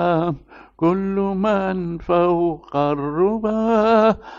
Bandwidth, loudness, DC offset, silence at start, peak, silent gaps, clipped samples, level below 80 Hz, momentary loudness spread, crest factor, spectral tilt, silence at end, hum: 7.2 kHz; -19 LUFS; under 0.1%; 0 s; -4 dBFS; none; under 0.1%; -46 dBFS; 7 LU; 14 dB; -8.5 dB/octave; 0 s; none